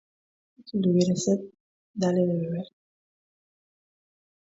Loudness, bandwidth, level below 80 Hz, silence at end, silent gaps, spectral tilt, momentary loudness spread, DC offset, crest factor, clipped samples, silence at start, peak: -26 LUFS; 7.8 kHz; -68 dBFS; 1.85 s; 1.60-1.94 s; -6.5 dB/octave; 18 LU; under 0.1%; 18 dB; under 0.1%; 0.65 s; -10 dBFS